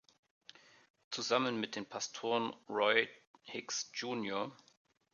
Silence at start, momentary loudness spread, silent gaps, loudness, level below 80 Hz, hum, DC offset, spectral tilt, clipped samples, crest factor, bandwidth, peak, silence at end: 1.1 s; 14 LU; 3.27-3.34 s; -36 LUFS; -86 dBFS; none; under 0.1%; -2.5 dB/octave; under 0.1%; 26 dB; 7.4 kHz; -14 dBFS; 0.6 s